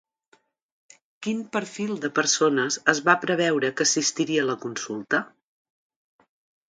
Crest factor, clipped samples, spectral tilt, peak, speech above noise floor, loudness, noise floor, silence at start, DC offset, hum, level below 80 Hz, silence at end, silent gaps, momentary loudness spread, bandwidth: 24 dB; under 0.1%; -2.5 dB/octave; -2 dBFS; 40 dB; -24 LUFS; -64 dBFS; 1.2 s; under 0.1%; none; -74 dBFS; 1.4 s; none; 10 LU; 10 kHz